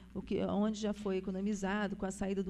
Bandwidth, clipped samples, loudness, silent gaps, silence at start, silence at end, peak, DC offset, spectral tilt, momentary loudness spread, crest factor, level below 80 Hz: 11.5 kHz; under 0.1%; -36 LUFS; none; 0 s; 0 s; -22 dBFS; under 0.1%; -6 dB/octave; 4 LU; 14 dB; -56 dBFS